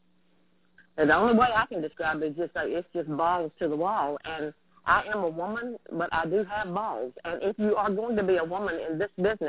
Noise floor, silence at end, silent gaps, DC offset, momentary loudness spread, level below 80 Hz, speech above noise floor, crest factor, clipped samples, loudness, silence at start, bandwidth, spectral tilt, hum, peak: -68 dBFS; 0 s; none; under 0.1%; 12 LU; -58 dBFS; 41 dB; 20 dB; under 0.1%; -28 LUFS; 0.95 s; 4 kHz; -9.5 dB/octave; none; -8 dBFS